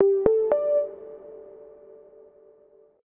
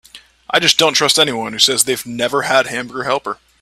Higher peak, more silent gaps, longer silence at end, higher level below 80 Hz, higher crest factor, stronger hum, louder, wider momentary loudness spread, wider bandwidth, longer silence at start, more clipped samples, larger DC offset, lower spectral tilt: second, -4 dBFS vs 0 dBFS; neither; first, 1.5 s vs 0.25 s; about the same, -56 dBFS vs -56 dBFS; first, 22 dB vs 16 dB; neither; second, -23 LUFS vs -14 LUFS; first, 25 LU vs 10 LU; second, 3.1 kHz vs 20 kHz; second, 0 s vs 0.15 s; neither; neither; first, -11 dB/octave vs -1.5 dB/octave